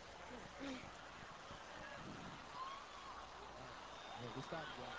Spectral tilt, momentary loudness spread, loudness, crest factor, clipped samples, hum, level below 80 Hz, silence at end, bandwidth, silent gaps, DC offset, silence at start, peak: -4 dB/octave; 6 LU; -52 LUFS; 18 dB; under 0.1%; none; -70 dBFS; 0 s; 8 kHz; none; under 0.1%; 0 s; -34 dBFS